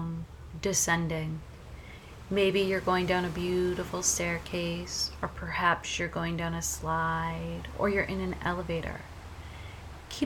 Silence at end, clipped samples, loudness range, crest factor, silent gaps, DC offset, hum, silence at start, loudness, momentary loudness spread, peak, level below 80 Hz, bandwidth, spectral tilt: 0 s; under 0.1%; 3 LU; 20 dB; none; under 0.1%; none; 0 s; -30 LUFS; 18 LU; -10 dBFS; -46 dBFS; 19.5 kHz; -3.5 dB/octave